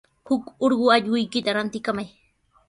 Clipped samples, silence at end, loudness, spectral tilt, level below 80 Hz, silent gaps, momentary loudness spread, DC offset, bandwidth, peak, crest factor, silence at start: under 0.1%; 0.6 s; -23 LUFS; -5 dB/octave; -64 dBFS; none; 10 LU; under 0.1%; 11.5 kHz; -4 dBFS; 20 dB; 0.25 s